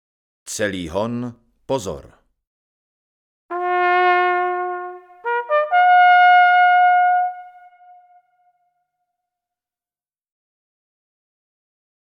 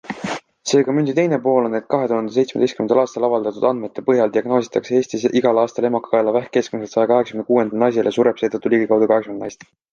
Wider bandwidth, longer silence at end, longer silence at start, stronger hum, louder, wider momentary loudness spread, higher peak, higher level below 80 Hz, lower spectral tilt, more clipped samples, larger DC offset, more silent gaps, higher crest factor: first, 11.5 kHz vs 9.4 kHz; first, 4.6 s vs 0.4 s; first, 0.45 s vs 0.05 s; neither; about the same, -16 LUFS vs -18 LUFS; first, 19 LU vs 5 LU; about the same, -4 dBFS vs -2 dBFS; first, -56 dBFS vs -64 dBFS; second, -4 dB/octave vs -6 dB/octave; neither; neither; first, 2.47-3.49 s vs none; about the same, 16 dB vs 16 dB